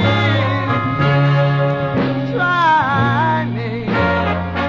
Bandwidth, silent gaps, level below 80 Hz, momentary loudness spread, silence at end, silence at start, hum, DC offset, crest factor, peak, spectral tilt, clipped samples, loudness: 7.2 kHz; none; -36 dBFS; 6 LU; 0 s; 0 s; none; under 0.1%; 12 dB; -4 dBFS; -8 dB/octave; under 0.1%; -16 LUFS